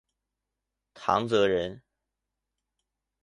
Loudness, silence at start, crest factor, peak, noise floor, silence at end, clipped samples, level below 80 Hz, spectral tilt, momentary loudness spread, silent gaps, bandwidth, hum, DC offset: -27 LUFS; 0.95 s; 24 dB; -8 dBFS; -86 dBFS; 1.45 s; under 0.1%; -62 dBFS; -5.5 dB/octave; 10 LU; none; 11 kHz; none; under 0.1%